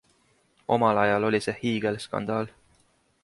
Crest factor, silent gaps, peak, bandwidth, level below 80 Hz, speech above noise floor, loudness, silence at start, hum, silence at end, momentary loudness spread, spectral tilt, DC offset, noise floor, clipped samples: 20 dB; none; -8 dBFS; 11.5 kHz; -62 dBFS; 40 dB; -26 LUFS; 0.7 s; none; 0.75 s; 10 LU; -6 dB/octave; under 0.1%; -65 dBFS; under 0.1%